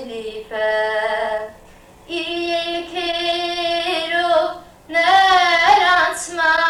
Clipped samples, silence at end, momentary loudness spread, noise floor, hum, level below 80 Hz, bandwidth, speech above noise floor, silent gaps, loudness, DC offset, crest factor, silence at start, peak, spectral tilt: under 0.1%; 0 s; 15 LU; -45 dBFS; none; -50 dBFS; 15 kHz; 23 dB; none; -17 LUFS; under 0.1%; 16 dB; 0 s; -2 dBFS; -1.5 dB/octave